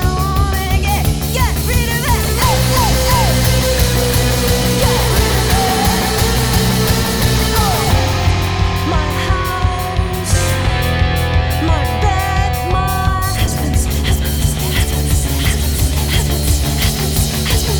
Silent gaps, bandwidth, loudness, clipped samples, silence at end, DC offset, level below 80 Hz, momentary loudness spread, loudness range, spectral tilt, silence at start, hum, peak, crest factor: none; over 20 kHz; -15 LUFS; under 0.1%; 0 s; 0.4%; -18 dBFS; 3 LU; 3 LU; -4.5 dB/octave; 0 s; none; -4 dBFS; 10 dB